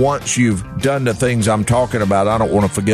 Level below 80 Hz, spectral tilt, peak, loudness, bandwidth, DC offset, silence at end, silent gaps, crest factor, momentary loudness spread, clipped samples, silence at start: -38 dBFS; -5.5 dB/octave; -4 dBFS; -16 LUFS; 13.5 kHz; under 0.1%; 0 s; none; 12 dB; 2 LU; under 0.1%; 0 s